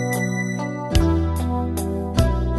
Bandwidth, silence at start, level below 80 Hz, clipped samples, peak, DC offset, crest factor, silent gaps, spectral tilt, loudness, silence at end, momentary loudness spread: 12.5 kHz; 0 s; -26 dBFS; under 0.1%; -4 dBFS; under 0.1%; 16 dB; none; -6 dB/octave; -22 LUFS; 0 s; 6 LU